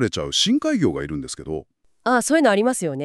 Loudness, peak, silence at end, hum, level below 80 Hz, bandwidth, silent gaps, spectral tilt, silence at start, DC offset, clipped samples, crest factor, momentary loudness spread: -20 LUFS; -4 dBFS; 0 s; none; -48 dBFS; 13.5 kHz; none; -4 dB/octave; 0 s; under 0.1%; under 0.1%; 18 dB; 13 LU